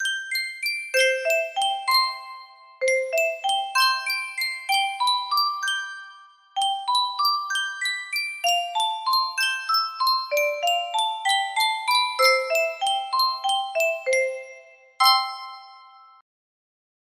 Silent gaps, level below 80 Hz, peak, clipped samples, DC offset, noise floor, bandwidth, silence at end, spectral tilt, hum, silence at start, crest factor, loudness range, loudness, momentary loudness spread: none; -78 dBFS; -4 dBFS; under 0.1%; under 0.1%; -49 dBFS; 16 kHz; 1.3 s; 3.5 dB/octave; none; 0 s; 20 dB; 3 LU; -22 LUFS; 7 LU